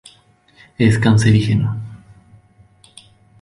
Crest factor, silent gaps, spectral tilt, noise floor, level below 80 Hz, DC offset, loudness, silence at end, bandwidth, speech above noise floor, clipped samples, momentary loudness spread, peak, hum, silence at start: 18 dB; none; -6.5 dB/octave; -52 dBFS; -42 dBFS; under 0.1%; -15 LUFS; 1.45 s; 11.5 kHz; 39 dB; under 0.1%; 15 LU; -2 dBFS; none; 0.8 s